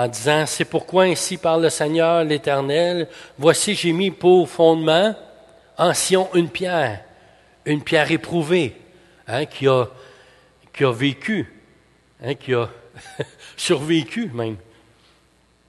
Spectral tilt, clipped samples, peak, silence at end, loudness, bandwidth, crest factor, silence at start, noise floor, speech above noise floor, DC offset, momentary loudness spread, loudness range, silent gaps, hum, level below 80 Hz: -4.5 dB/octave; under 0.1%; 0 dBFS; 1.1 s; -19 LUFS; 12.5 kHz; 20 dB; 0 s; -58 dBFS; 39 dB; under 0.1%; 15 LU; 7 LU; none; none; -58 dBFS